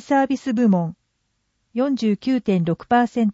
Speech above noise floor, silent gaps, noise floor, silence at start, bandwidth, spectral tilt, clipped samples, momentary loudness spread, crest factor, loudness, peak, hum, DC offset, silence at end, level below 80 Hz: 52 dB; none; -71 dBFS; 0.1 s; 8 kHz; -7.5 dB/octave; under 0.1%; 5 LU; 14 dB; -20 LUFS; -6 dBFS; none; under 0.1%; 0 s; -60 dBFS